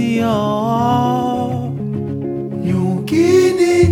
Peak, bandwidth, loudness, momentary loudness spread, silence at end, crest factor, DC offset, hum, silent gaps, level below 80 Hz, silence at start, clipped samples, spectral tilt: 0 dBFS; 16 kHz; -16 LUFS; 10 LU; 0 s; 14 dB; under 0.1%; none; none; -40 dBFS; 0 s; under 0.1%; -7 dB/octave